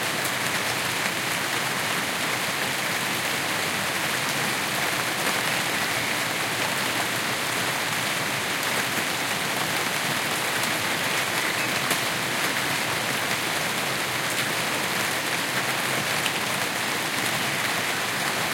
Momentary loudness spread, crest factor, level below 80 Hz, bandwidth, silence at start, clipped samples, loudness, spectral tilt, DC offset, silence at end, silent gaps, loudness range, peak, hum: 1 LU; 18 dB; -66 dBFS; 17 kHz; 0 s; under 0.1%; -24 LUFS; -2 dB/octave; under 0.1%; 0 s; none; 1 LU; -8 dBFS; none